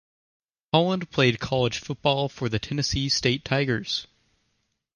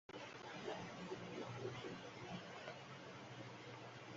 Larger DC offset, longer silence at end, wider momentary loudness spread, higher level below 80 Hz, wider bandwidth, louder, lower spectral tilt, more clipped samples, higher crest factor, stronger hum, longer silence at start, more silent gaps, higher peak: neither; first, 0.9 s vs 0 s; about the same, 5 LU vs 5 LU; first, -48 dBFS vs -80 dBFS; first, 10.5 kHz vs 7.6 kHz; first, -25 LUFS vs -52 LUFS; about the same, -4.5 dB/octave vs -4 dB/octave; neither; about the same, 20 dB vs 16 dB; neither; first, 0.75 s vs 0.1 s; neither; first, -6 dBFS vs -36 dBFS